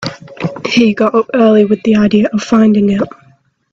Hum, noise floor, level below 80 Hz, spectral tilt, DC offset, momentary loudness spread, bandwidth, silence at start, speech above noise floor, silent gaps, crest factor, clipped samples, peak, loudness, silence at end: none; -49 dBFS; -48 dBFS; -6.5 dB/octave; under 0.1%; 13 LU; 7.6 kHz; 0 s; 40 dB; none; 12 dB; under 0.1%; 0 dBFS; -11 LUFS; 0.65 s